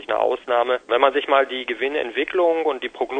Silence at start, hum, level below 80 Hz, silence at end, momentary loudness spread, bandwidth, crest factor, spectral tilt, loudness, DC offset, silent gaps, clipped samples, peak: 0 s; none; -62 dBFS; 0 s; 6 LU; 9 kHz; 20 dB; -4 dB/octave; -21 LUFS; under 0.1%; none; under 0.1%; 0 dBFS